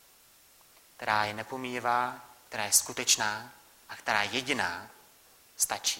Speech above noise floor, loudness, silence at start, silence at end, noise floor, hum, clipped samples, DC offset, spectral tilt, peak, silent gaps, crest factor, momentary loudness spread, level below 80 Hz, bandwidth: 29 dB; -29 LUFS; 1 s; 0 s; -60 dBFS; none; under 0.1%; under 0.1%; -0.5 dB/octave; -8 dBFS; none; 24 dB; 15 LU; -70 dBFS; 16.5 kHz